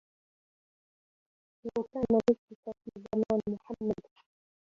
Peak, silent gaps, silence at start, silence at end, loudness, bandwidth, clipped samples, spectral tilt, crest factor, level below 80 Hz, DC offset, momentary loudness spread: -12 dBFS; 2.39-2.48 s, 2.55-2.63 s; 1.65 s; 0.85 s; -32 LUFS; 7.4 kHz; under 0.1%; -8.5 dB/octave; 22 dB; -64 dBFS; under 0.1%; 18 LU